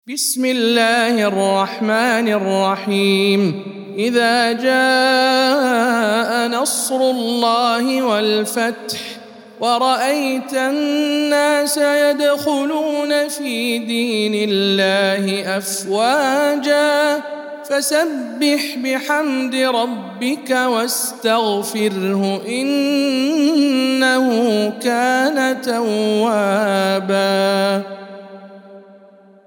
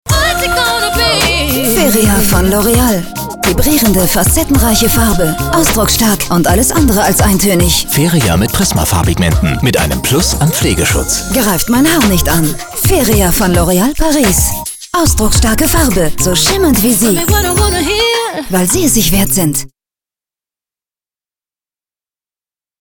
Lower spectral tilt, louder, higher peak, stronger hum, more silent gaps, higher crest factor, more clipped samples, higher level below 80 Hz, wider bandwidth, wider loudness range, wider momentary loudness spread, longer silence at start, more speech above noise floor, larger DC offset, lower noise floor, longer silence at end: about the same, -3.5 dB/octave vs -4 dB/octave; second, -17 LUFS vs -10 LUFS; about the same, -2 dBFS vs 0 dBFS; neither; neither; first, 16 dB vs 10 dB; neither; second, -76 dBFS vs -20 dBFS; second, 18 kHz vs over 20 kHz; about the same, 3 LU vs 3 LU; first, 6 LU vs 3 LU; about the same, 0.05 s vs 0.05 s; second, 29 dB vs over 80 dB; neither; second, -46 dBFS vs under -90 dBFS; second, 0.65 s vs 3.15 s